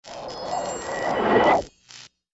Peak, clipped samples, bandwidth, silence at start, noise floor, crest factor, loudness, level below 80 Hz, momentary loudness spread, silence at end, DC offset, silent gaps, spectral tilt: -8 dBFS; under 0.1%; 8 kHz; 0.05 s; -48 dBFS; 18 dB; -23 LUFS; -52 dBFS; 25 LU; 0.25 s; under 0.1%; none; -4 dB/octave